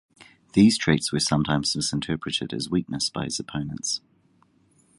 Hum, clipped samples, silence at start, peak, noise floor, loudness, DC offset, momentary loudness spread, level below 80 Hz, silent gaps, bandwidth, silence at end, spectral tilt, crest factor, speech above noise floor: none; under 0.1%; 0.2 s; -4 dBFS; -62 dBFS; -24 LUFS; under 0.1%; 10 LU; -52 dBFS; none; 11.5 kHz; 1 s; -4 dB/octave; 22 dB; 38 dB